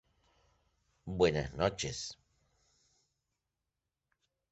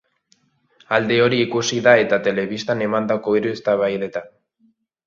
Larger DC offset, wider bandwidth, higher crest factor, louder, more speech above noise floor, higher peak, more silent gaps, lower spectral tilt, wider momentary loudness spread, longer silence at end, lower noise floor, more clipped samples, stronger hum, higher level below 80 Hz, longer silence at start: neither; about the same, 8 kHz vs 7.4 kHz; about the same, 24 dB vs 20 dB; second, -34 LUFS vs -19 LUFS; first, 55 dB vs 44 dB; second, -14 dBFS vs 0 dBFS; neither; about the same, -4.5 dB/octave vs -4.5 dB/octave; first, 14 LU vs 9 LU; first, 2.4 s vs 0.8 s; first, -89 dBFS vs -62 dBFS; neither; neither; about the same, -58 dBFS vs -62 dBFS; first, 1.05 s vs 0.9 s